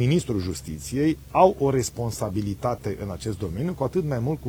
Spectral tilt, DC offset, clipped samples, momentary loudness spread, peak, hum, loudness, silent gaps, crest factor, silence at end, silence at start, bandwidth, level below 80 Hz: -6.5 dB/octave; under 0.1%; under 0.1%; 12 LU; -4 dBFS; none; -25 LUFS; none; 20 dB; 0 s; 0 s; over 20 kHz; -44 dBFS